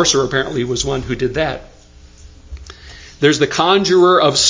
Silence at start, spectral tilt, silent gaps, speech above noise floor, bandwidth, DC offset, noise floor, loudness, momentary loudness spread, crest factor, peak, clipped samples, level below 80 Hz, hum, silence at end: 0 s; -3.5 dB/octave; none; 28 dB; 7.8 kHz; under 0.1%; -42 dBFS; -15 LUFS; 25 LU; 16 dB; 0 dBFS; under 0.1%; -38 dBFS; none; 0 s